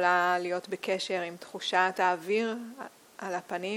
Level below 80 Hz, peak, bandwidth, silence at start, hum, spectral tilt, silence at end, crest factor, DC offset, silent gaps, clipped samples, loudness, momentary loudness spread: -82 dBFS; -10 dBFS; 16.5 kHz; 0 s; none; -3.5 dB/octave; 0 s; 20 dB; under 0.1%; none; under 0.1%; -30 LUFS; 15 LU